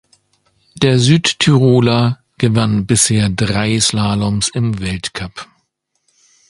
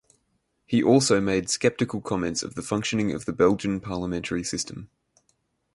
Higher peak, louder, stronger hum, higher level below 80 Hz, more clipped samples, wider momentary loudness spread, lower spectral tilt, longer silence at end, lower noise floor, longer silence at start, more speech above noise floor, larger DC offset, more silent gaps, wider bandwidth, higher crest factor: first, 0 dBFS vs -6 dBFS; first, -14 LUFS vs -25 LUFS; neither; first, -40 dBFS vs -52 dBFS; neither; about the same, 10 LU vs 10 LU; about the same, -4.5 dB/octave vs -4.5 dB/octave; first, 1.05 s vs 0.9 s; second, -67 dBFS vs -73 dBFS; about the same, 0.75 s vs 0.7 s; first, 53 dB vs 48 dB; neither; neither; about the same, 11.5 kHz vs 11.5 kHz; about the same, 16 dB vs 20 dB